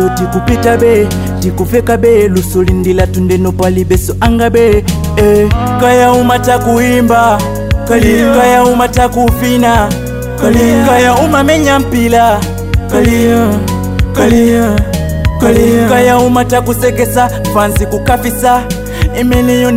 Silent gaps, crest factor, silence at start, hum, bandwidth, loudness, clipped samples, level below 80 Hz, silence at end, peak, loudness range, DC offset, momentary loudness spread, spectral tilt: none; 8 dB; 0 s; none; 16.5 kHz; -9 LUFS; under 0.1%; -20 dBFS; 0 s; 0 dBFS; 2 LU; under 0.1%; 6 LU; -6 dB/octave